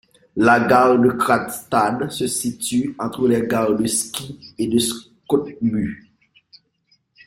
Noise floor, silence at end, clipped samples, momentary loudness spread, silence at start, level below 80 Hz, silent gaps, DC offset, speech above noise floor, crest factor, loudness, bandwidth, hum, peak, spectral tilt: -64 dBFS; 1.3 s; under 0.1%; 13 LU; 0.35 s; -54 dBFS; none; under 0.1%; 45 dB; 18 dB; -19 LUFS; 16.5 kHz; none; -2 dBFS; -4.5 dB/octave